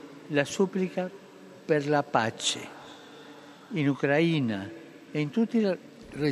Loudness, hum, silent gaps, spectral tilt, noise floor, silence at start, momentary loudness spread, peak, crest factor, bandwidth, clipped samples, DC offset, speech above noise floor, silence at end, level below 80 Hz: -28 LUFS; none; none; -5 dB/octave; -49 dBFS; 0 s; 22 LU; -8 dBFS; 22 dB; 13 kHz; under 0.1%; under 0.1%; 22 dB; 0 s; -70 dBFS